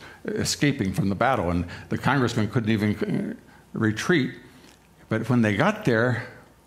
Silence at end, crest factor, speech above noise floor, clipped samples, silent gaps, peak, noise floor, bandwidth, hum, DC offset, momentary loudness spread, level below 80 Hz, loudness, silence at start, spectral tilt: 0.25 s; 18 dB; 28 dB; under 0.1%; none; -6 dBFS; -52 dBFS; 15.5 kHz; none; under 0.1%; 10 LU; -52 dBFS; -24 LUFS; 0 s; -5.5 dB/octave